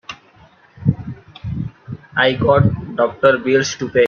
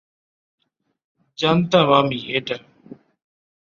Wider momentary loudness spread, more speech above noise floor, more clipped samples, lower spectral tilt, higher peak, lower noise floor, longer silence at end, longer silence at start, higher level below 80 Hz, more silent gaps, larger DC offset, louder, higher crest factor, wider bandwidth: first, 19 LU vs 13 LU; first, 34 dB vs 27 dB; neither; about the same, -5.5 dB/octave vs -6 dB/octave; about the same, 0 dBFS vs -2 dBFS; first, -49 dBFS vs -45 dBFS; second, 0 s vs 1.2 s; second, 0.1 s vs 1.4 s; first, -44 dBFS vs -60 dBFS; neither; neither; about the same, -17 LUFS vs -19 LUFS; about the same, 18 dB vs 22 dB; about the same, 7.2 kHz vs 7.2 kHz